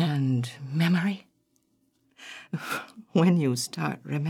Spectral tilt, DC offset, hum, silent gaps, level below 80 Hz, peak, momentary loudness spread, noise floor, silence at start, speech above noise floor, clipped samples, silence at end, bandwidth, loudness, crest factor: -6 dB/octave; under 0.1%; none; none; -78 dBFS; -10 dBFS; 16 LU; -70 dBFS; 0 s; 44 dB; under 0.1%; 0 s; 16 kHz; -27 LUFS; 18 dB